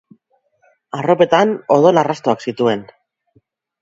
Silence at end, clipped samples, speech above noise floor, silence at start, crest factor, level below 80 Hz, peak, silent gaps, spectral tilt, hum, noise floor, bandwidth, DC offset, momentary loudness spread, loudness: 1 s; under 0.1%; 47 dB; 0.95 s; 18 dB; -64 dBFS; 0 dBFS; none; -6 dB/octave; none; -61 dBFS; 7.8 kHz; under 0.1%; 11 LU; -15 LUFS